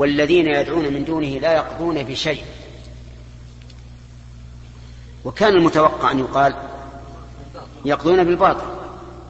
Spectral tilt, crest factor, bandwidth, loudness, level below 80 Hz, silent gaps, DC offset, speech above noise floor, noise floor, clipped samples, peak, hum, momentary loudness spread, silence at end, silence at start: -6 dB/octave; 18 dB; 8.2 kHz; -18 LUFS; -42 dBFS; none; under 0.1%; 22 dB; -39 dBFS; under 0.1%; -2 dBFS; 60 Hz at -40 dBFS; 25 LU; 0 s; 0 s